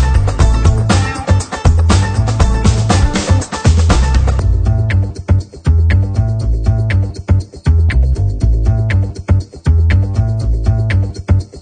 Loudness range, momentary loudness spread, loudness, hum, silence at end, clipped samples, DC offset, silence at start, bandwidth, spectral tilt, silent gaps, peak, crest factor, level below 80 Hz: 2 LU; 4 LU; -14 LUFS; none; 0 s; under 0.1%; under 0.1%; 0 s; 9.4 kHz; -6 dB/octave; none; 0 dBFS; 12 dB; -16 dBFS